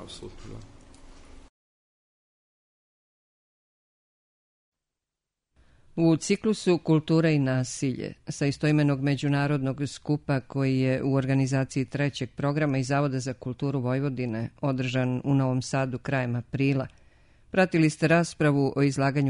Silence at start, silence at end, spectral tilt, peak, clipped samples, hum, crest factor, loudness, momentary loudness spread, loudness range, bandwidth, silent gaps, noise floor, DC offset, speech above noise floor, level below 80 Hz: 0 s; 0 s; -6.5 dB/octave; -8 dBFS; under 0.1%; none; 20 dB; -26 LUFS; 9 LU; 3 LU; 10.5 kHz; 1.49-4.72 s; -87 dBFS; under 0.1%; 62 dB; -56 dBFS